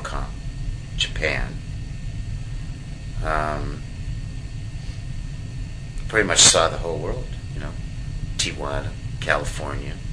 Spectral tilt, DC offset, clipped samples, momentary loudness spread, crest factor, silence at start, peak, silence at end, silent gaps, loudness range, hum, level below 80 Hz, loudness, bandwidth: -2.5 dB/octave; 0.5%; under 0.1%; 15 LU; 22 dB; 0 s; -2 dBFS; 0 s; none; 10 LU; none; -32 dBFS; -24 LUFS; 11 kHz